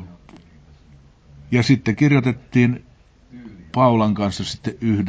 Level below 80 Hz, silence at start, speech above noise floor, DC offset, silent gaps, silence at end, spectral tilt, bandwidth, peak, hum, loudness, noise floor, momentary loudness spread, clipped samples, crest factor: -46 dBFS; 0 s; 31 dB; under 0.1%; none; 0 s; -7 dB/octave; 8 kHz; -2 dBFS; none; -19 LUFS; -49 dBFS; 11 LU; under 0.1%; 18 dB